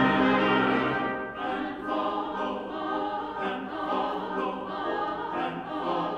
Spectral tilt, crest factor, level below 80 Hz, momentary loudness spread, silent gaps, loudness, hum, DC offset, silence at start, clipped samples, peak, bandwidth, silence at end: -7 dB/octave; 18 dB; -58 dBFS; 9 LU; none; -29 LUFS; none; under 0.1%; 0 s; under 0.1%; -10 dBFS; 8.4 kHz; 0 s